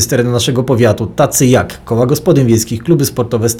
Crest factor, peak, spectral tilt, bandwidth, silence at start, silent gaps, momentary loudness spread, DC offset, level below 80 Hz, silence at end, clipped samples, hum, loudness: 10 dB; 0 dBFS; -5 dB/octave; 20 kHz; 0 s; none; 4 LU; under 0.1%; -40 dBFS; 0 s; under 0.1%; none; -12 LUFS